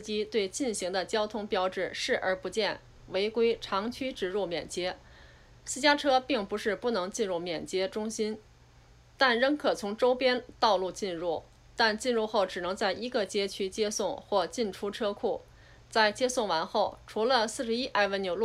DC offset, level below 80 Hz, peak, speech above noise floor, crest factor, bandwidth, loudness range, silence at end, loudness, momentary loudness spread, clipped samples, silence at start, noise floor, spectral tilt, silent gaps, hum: under 0.1%; -60 dBFS; -12 dBFS; 28 dB; 18 dB; 14.5 kHz; 3 LU; 0 s; -30 LUFS; 8 LU; under 0.1%; 0 s; -57 dBFS; -3 dB/octave; none; none